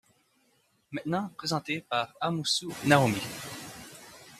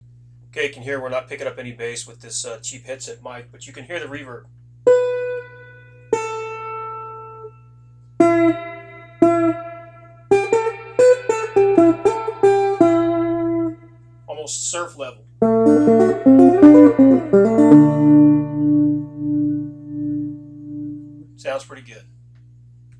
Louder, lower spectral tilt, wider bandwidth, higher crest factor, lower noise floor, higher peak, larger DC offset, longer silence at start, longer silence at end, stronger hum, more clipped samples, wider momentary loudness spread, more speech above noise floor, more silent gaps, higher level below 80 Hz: second, -29 LUFS vs -16 LUFS; second, -4.5 dB/octave vs -6.5 dB/octave; first, 15 kHz vs 10 kHz; first, 26 dB vs 18 dB; first, -69 dBFS vs -46 dBFS; second, -4 dBFS vs 0 dBFS; neither; first, 0.9 s vs 0.55 s; second, 0 s vs 1.2 s; second, none vs 60 Hz at -40 dBFS; neither; about the same, 20 LU vs 22 LU; first, 41 dB vs 26 dB; neither; second, -66 dBFS vs -52 dBFS